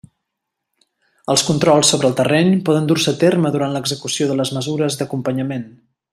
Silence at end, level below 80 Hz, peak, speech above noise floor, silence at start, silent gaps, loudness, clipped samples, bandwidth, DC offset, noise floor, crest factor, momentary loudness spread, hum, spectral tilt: 0.45 s; -56 dBFS; 0 dBFS; 62 dB; 1.3 s; none; -17 LUFS; under 0.1%; 14.5 kHz; under 0.1%; -79 dBFS; 18 dB; 9 LU; none; -4.5 dB/octave